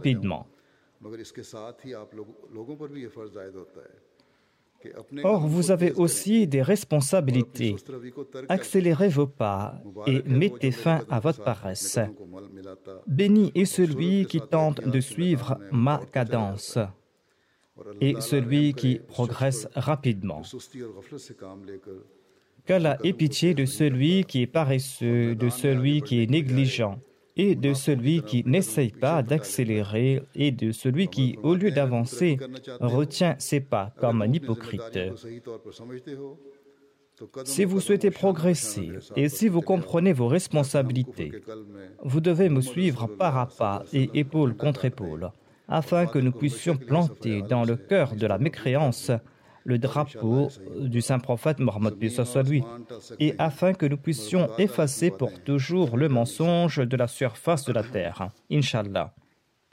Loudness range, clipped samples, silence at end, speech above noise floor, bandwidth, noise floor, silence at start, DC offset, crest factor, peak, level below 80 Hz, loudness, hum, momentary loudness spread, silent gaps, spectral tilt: 6 LU; under 0.1%; 0.65 s; 43 dB; 16 kHz; -67 dBFS; 0 s; under 0.1%; 14 dB; -12 dBFS; -64 dBFS; -25 LUFS; none; 18 LU; none; -6.5 dB/octave